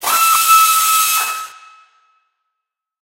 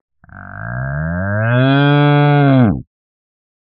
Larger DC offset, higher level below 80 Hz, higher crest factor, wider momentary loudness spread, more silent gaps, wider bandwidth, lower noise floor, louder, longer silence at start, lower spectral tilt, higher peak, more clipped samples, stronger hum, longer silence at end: neither; second, -64 dBFS vs -40 dBFS; about the same, 16 dB vs 14 dB; about the same, 15 LU vs 14 LU; neither; first, 16 kHz vs 4.6 kHz; first, -80 dBFS vs -34 dBFS; about the same, -11 LUFS vs -13 LUFS; second, 0 s vs 0.35 s; second, 3.5 dB/octave vs -6.5 dB/octave; about the same, 0 dBFS vs 0 dBFS; neither; neither; first, 1.55 s vs 0.9 s